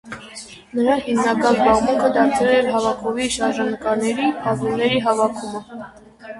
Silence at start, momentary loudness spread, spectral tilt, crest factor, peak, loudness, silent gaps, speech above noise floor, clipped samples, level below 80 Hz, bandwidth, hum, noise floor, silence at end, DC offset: 0.05 s; 18 LU; -4.5 dB/octave; 18 dB; -2 dBFS; -19 LUFS; none; 20 dB; under 0.1%; -50 dBFS; 11.5 kHz; none; -39 dBFS; 0 s; under 0.1%